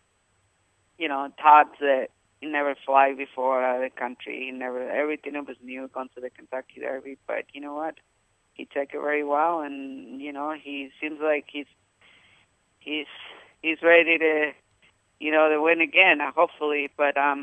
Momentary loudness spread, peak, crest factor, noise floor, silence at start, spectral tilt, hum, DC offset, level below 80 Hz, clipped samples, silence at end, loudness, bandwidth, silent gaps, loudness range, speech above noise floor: 20 LU; -2 dBFS; 22 dB; -68 dBFS; 1 s; -4.5 dB/octave; none; under 0.1%; -78 dBFS; under 0.1%; 0 s; -24 LUFS; 8.4 kHz; none; 12 LU; 44 dB